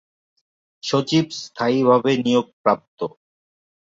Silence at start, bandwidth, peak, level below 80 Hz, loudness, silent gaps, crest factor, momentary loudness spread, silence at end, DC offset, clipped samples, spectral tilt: 0.85 s; 7.8 kHz; -2 dBFS; -64 dBFS; -20 LUFS; 2.53-2.64 s, 2.88-2.97 s; 20 dB; 14 LU; 0.8 s; under 0.1%; under 0.1%; -5.5 dB/octave